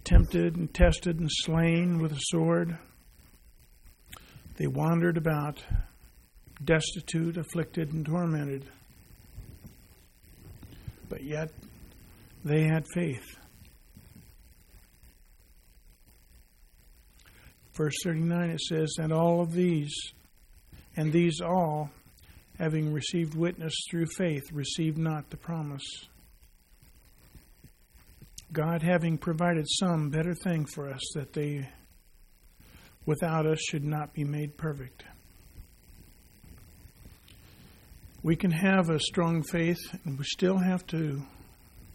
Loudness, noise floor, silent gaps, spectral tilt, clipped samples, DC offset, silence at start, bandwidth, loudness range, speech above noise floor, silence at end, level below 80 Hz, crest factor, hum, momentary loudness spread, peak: -30 LUFS; -58 dBFS; none; -6 dB/octave; under 0.1%; under 0.1%; 0.05 s; 16 kHz; 11 LU; 30 dB; 0 s; -40 dBFS; 24 dB; none; 17 LU; -8 dBFS